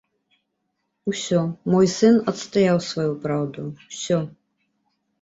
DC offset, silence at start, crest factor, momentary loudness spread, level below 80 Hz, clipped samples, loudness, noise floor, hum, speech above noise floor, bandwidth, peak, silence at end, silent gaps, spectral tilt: under 0.1%; 1.05 s; 18 dB; 15 LU; -62 dBFS; under 0.1%; -22 LUFS; -75 dBFS; none; 54 dB; 8 kHz; -4 dBFS; 0.95 s; none; -6 dB/octave